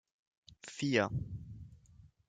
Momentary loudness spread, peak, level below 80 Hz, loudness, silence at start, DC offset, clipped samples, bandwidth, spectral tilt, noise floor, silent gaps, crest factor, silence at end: 21 LU; -16 dBFS; -60 dBFS; -35 LUFS; 0.5 s; under 0.1%; under 0.1%; 9.4 kHz; -5.5 dB/octave; -62 dBFS; none; 24 dB; 0.2 s